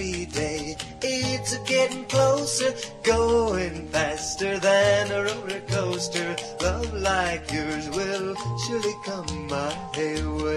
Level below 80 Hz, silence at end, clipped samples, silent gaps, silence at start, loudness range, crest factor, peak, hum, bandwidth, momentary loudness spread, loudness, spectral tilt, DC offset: -42 dBFS; 0 s; under 0.1%; none; 0 s; 4 LU; 16 dB; -8 dBFS; none; 13 kHz; 9 LU; -25 LUFS; -4 dB/octave; under 0.1%